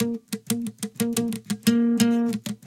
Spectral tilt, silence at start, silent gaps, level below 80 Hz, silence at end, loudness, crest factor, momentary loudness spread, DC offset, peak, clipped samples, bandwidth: -4.5 dB/octave; 0 s; none; -62 dBFS; 0.1 s; -24 LUFS; 18 dB; 8 LU; under 0.1%; -6 dBFS; under 0.1%; 17 kHz